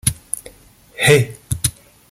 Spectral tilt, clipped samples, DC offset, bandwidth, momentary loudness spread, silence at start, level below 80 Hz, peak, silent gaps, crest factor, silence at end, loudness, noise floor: -3.5 dB/octave; under 0.1%; under 0.1%; 17 kHz; 14 LU; 0.05 s; -40 dBFS; 0 dBFS; none; 20 dB; 0.4 s; -18 LUFS; -47 dBFS